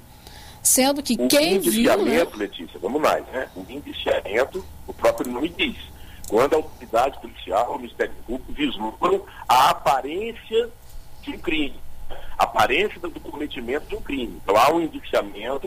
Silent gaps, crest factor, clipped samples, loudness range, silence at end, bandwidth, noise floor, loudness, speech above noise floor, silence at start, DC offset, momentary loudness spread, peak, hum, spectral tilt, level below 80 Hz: none; 18 dB; under 0.1%; 5 LU; 0 s; 16 kHz; -43 dBFS; -22 LUFS; 20 dB; 0.1 s; under 0.1%; 16 LU; -4 dBFS; none; -3 dB/octave; -42 dBFS